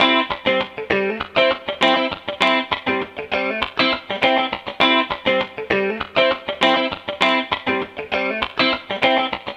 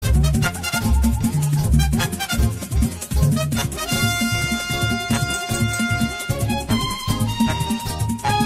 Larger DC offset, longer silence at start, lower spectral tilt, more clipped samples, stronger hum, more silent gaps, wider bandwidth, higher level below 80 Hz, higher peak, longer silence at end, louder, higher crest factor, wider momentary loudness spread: neither; about the same, 0 s vs 0 s; about the same, -4.5 dB/octave vs -4.5 dB/octave; neither; neither; neither; second, 11 kHz vs 16 kHz; second, -52 dBFS vs -26 dBFS; first, -2 dBFS vs -6 dBFS; about the same, 0 s vs 0 s; about the same, -19 LUFS vs -21 LUFS; about the same, 18 dB vs 14 dB; about the same, 6 LU vs 4 LU